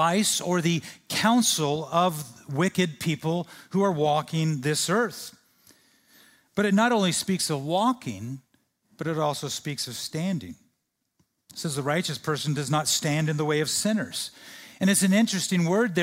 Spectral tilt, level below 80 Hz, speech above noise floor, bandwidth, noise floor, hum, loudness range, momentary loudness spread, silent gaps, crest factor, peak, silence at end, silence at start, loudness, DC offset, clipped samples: -4 dB/octave; -68 dBFS; 52 dB; 16 kHz; -77 dBFS; none; 6 LU; 13 LU; none; 20 dB; -8 dBFS; 0 s; 0 s; -25 LUFS; under 0.1%; under 0.1%